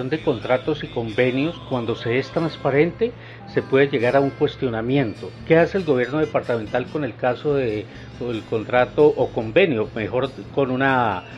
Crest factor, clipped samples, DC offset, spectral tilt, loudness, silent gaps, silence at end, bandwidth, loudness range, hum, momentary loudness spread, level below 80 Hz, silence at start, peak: 18 dB; under 0.1%; under 0.1%; -7.5 dB/octave; -21 LUFS; none; 0 s; 8 kHz; 2 LU; none; 9 LU; -50 dBFS; 0 s; -2 dBFS